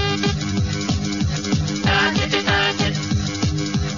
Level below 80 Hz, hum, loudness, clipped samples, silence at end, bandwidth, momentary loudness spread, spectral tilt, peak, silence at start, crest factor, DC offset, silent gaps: -34 dBFS; none; -20 LUFS; under 0.1%; 0 s; 7.4 kHz; 5 LU; -4.5 dB/octave; -4 dBFS; 0 s; 16 dB; 0.4%; none